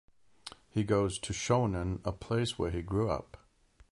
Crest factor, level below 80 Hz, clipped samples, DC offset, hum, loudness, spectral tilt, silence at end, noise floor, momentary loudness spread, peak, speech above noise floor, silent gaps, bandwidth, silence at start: 18 dB; -48 dBFS; under 0.1%; under 0.1%; none; -33 LUFS; -5.5 dB/octave; 0.55 s; -64 dBFS; 9 LU; -16 dBFS; 32 dB; none; 11.5 kHz; 0.45 s